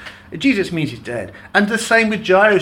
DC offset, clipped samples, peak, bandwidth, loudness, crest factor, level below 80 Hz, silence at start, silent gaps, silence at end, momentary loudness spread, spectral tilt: under 0.1%; under 0.1%; -2 dBFS; 17 kHz; -17 LUFS; 14 dB; -50 dBFS; 0 s; none; 0 s; 14 LU; -4.5 dB/octave